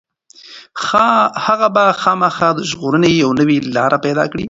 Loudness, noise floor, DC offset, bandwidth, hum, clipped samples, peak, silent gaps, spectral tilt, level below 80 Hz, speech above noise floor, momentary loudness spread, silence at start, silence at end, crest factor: -14 LUFS; -42 dBFS; under 0.1%; 8 kHz; none; under 0.1%; 0 dBFS; none; -5.5 dB/octave; -50 dBFS; 28 dB; 5 LU; 0.45 s; 0 s; 14 dB